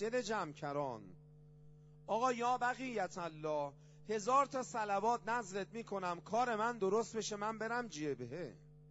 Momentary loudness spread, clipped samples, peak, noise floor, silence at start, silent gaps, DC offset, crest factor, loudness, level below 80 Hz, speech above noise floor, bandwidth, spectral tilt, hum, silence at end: 10 LU; under 0.1%; -20 dBFS; -60 dBFS; 0 s; none; under 0.1%; 18 dB; -39 LUFS; -72 dBFS; 22 dB; 7.6 kHz; -3.5 dB/octave; none; 0 s